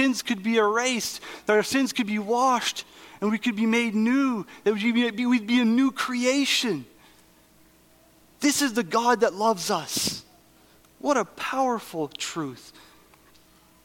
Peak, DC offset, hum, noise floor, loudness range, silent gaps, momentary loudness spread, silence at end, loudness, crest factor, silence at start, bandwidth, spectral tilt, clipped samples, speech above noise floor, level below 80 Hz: -6 dBFS; under 0.1%; none; -57 dBFS; 5 LU; none; 9 LU; 1.15 s; -24 LUFS; 18 dB; 0 s; 17 kHz; -3 dB/octave; under 0.1%; 33 dB; -66 dBFS